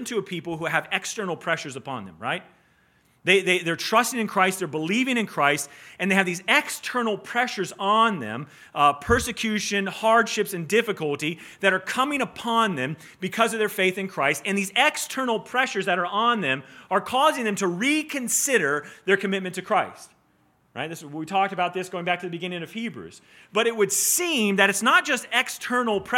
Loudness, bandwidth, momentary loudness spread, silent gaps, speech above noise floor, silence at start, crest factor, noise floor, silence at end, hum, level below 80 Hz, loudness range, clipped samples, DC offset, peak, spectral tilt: -23 LUFS; 17.5 kHz; 11 LU; none; 39 dB; 0 s; 22 dB; -64 dBFS; 0 s; none; -56 dBFS; 5 LU; under 0.1%; under 0.1%; -2 dBFS; -3 dB/octave